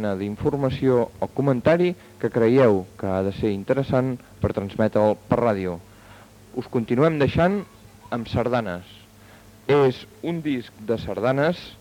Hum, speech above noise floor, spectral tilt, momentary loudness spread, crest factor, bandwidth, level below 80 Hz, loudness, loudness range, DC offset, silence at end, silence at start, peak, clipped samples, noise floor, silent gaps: none; 26 dB; -8 dB/octave; 11 LU; 18 dB; 18.5 kHz; -50 dBFS; -23 LUFS; 4 LU; under 0.1%; 0.05 s; 0 s; -4 dBFS; under 0.1%; -48 dBFS; none